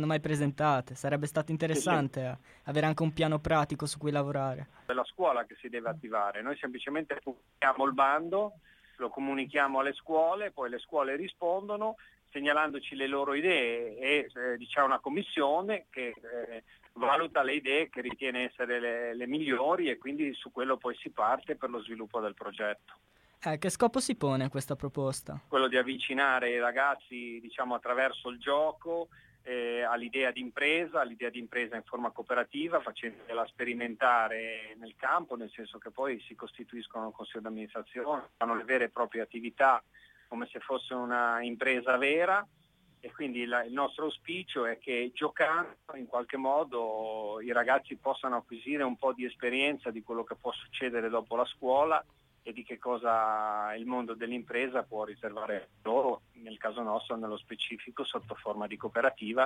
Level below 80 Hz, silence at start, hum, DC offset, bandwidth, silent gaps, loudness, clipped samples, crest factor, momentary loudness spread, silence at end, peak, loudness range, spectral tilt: -66 dBFS; 0 s; none; under 0.1%; 15.5 kHz; none; -32 LUFS; under 0.1%; 20 dB; 12 LU; 0 s; -12 dBFS; 4 LU; -5 dB/octave